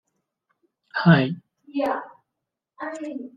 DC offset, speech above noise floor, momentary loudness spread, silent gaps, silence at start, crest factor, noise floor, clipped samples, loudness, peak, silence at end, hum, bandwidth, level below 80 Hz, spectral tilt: under 0.1%; 62 dB; 17 LU; none; 0.95 s; 24 dB; -84 dBFS; under 0.1%; -23 LUFS; -2 dBFS; 0.1 s; none; 7.6 kHz; -64 dBFS; -8 dB/octave